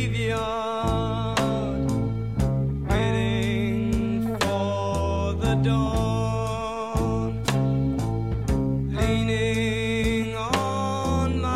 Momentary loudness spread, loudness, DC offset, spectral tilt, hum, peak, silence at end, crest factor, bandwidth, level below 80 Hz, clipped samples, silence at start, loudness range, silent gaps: 3 LU; -25 LUFS; 0.3%; -6.5 dB/octave; none; -8 dBFS; 0 s; 16 dB; 14.5 kHz; -34 dBFS; under 0.1%; 0 s; 1 LU; none